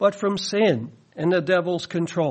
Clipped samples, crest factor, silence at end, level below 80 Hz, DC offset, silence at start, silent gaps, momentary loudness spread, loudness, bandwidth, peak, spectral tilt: under 0.1%; 16 dB; 0 s; -66 dBFS; under 0.1%; 0 s; none; 7 LU; -23 LUFS; 8.8 kHz; -6 dBFS; -5.5 dB/octave